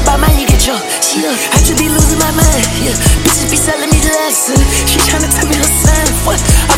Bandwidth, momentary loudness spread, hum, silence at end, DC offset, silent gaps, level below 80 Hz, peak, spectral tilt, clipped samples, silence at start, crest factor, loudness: 17 kHz; 2 LU; none; 0 s; under 0.1%; none; -16 dBFS; 0 dBFS; -3.5 dB/octave; 0.2%; 0 s; 10 dB; -10 LUFS